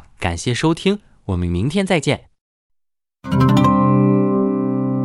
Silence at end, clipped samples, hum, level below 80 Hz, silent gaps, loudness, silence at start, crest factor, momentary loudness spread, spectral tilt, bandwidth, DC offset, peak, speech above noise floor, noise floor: 0 s; under 0.1%; none; -42 dBFS; 2.41-2.70 s; -18 LUFS; 0.2 s; 16 dB; 11 LU; -6.5 dB/octave; 12 kHz; under 0.1%; -2 dBFS; 57 dB; -74 dBFS